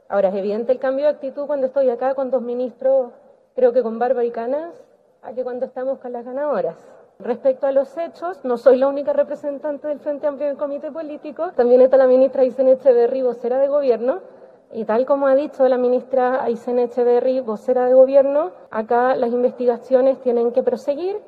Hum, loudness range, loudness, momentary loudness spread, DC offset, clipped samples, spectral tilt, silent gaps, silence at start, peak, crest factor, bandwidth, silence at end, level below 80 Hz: none; 7 LU; -19 LUFS; 13 LU; under 0.1%; under 0.1%; -7.5 dB/octave; none; 0.1 s; 0 dBFS; 18 dB; 4.8 kHz; 0.05 s; -70 dBFS